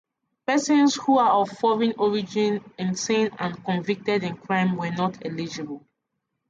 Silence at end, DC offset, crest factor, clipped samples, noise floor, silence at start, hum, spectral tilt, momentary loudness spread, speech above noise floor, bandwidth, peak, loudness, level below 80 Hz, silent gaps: 0.7 s; under 0.1%; 14 dB; under 0.1%; -79 dBFS; 0.5 s; none; -5 dB/octave; 12 LU; 56 dB; 9.4 kHz; -10 dBFS; -24 LUFS; -68 dBFS; none